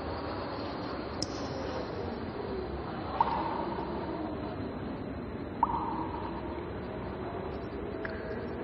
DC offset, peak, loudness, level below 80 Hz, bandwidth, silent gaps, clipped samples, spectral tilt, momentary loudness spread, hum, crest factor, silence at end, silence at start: under 0.1%; -14 dBFS; -36 LUFS; -48 dBFS; 9.8 kHz; none; under 0.1%; -6 dB/octave; 7 LU; none; 22 dB; 0 s; 0 s